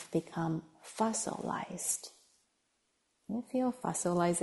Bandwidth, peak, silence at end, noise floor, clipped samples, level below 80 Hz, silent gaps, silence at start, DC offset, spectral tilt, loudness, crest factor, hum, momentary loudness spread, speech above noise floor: 11.5 kHz; -18 dBFS; 0 s; -78 dBFS; under 0.1%; -72 dBFS; none; 0 s; under 0.1%; -4.5 dB/octave; -35 LUFS; 18 dB; none; 9 LU; 44 dB